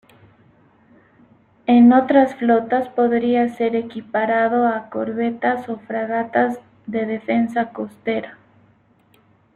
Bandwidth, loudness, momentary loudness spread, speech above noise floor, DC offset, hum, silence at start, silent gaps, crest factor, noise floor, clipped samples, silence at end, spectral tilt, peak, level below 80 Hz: 4.3 kHz; -19 LUFS; 13 LU; 38 dB; under 0.1%; none; 1.7 s; none; 16 dB; -56 dBFS; under 0.1%; 1.2 s; -7.5 dB/octave; -2 dBFS; -64 dBFS